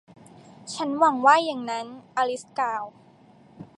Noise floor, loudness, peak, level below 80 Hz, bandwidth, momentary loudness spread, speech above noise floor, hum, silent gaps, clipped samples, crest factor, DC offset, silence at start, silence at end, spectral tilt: -54 dBFS; -24 LUFS; -4 dBFS; -76 dBFS; 11.5 kHz; 16 LU; 30 dB; none; none; under 0.1%; 22 dB; under 0.1%; 0.6 s; 0.15 s; -3.5 dB/octave